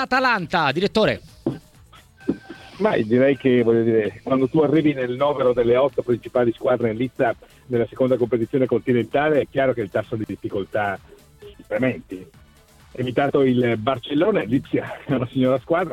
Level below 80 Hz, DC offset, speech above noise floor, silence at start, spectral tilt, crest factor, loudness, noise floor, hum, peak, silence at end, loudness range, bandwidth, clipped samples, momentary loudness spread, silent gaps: -52 dBFS; under 0.1%; 30 dB; 0 s; -7.5 dB/octave; 16 dB; -21 LUFS; -51 dBFS; none; -6 dBFS; 0 s; 5 LU; 13 kHz; under 0.1%; 11 LU; none